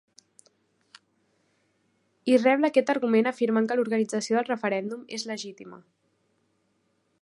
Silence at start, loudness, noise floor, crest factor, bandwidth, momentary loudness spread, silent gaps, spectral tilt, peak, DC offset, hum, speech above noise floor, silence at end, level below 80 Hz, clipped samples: 2.25 s; -25 LUFS; -72 dBFS; 20 dB; 11.5 kHz; 14 LU; none; -4.5 dB/octave; -8 dBFS; under 0.1%; none; 47 dB; 1.45 s; -82 dBFS; under 0.1%